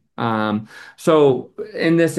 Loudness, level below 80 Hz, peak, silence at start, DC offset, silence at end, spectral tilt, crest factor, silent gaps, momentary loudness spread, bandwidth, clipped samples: -18 LUFS; -66 dBFS; -2 dBFS; 0.2 s; under 0.1%; 0 s; -6.5 dB/octave; 16 dB; none; 13 LU; 12.5 kHz; under 0.1%